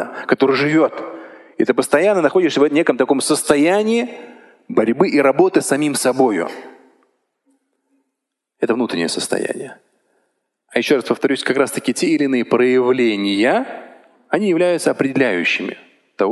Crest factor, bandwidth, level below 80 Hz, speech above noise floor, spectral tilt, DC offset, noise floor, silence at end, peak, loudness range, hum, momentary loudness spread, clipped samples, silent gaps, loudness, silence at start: 18 dB; 12.5 kHz; -66 dBFS; 62 dB; -4.5 dB/octave; under 0.1%; -78 dBFS; 0 s; 0 dBFS; 8 LU; none; 13 LU; under 0.1%; none; -17 LUFS; 0 s